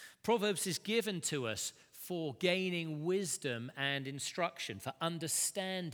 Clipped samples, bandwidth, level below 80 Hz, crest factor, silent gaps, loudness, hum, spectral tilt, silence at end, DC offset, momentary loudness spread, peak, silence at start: under 0.1%; over 20 kHz; -80 dBFS; 20 dB; none; -36 LUFS; none; -3 dB/octave; 0 s; under 0.1%; 7 LU; -16 dBFS; 0 s